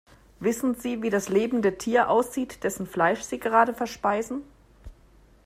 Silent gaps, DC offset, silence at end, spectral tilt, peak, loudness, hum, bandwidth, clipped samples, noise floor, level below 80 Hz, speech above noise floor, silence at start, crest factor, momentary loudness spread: none; under 0.1%; 0.55 s; -5 dB/octave; -6 dBFS; -25 LUFS; none; 15.5 kHz; under 0.1%; -56 dBFS; -54 dBFS; 31 dB; 0.4 s; 20 dB; 8 LU